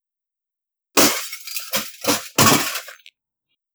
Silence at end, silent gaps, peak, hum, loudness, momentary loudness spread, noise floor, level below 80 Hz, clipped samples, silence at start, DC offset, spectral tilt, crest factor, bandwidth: 0.8 s; none; 0 dBFS; none; -18 LUFS; 13 LU; -87 dBFS; -60 dBFS; under 0.1%; 0.95 s; under 0.1%; -2 dB/octave; 22 dB; over 20 kHz